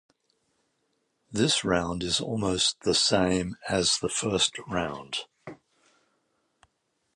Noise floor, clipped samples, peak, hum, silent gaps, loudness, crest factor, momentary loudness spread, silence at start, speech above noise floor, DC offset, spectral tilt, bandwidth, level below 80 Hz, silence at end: -75 dBFS; under 0.1%; -8 dBFS; none; none; -26 LUFS; 20 dB; 12 LU; 1.3 s; 49 dB; under 0.1%; -3 dB/octave; 11.5 kHz; -52 dBFS; 1.6 s